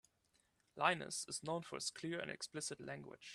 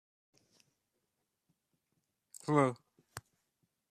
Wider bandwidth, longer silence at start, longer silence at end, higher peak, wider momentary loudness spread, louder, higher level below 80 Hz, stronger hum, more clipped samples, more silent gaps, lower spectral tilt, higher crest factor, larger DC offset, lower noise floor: about the same, 15 kHz vs 14 kHz; second, 0.75 s vs 2.45 s; second, 0 s vs 0.7 s; second, -18 dBFS vs -14 dBFS; second, 13 LU vs 21 LU; second, -43 LUFS vs -33 LUFS; about the same, -82 dBFS vs -82 dBFS; neither; neither; neither; second, -2.5 dB/octave vs -6.5 dB/octave; about the same, 26 dB vs 28 dB; neither; second, -79 dBFS vs -85 dBFS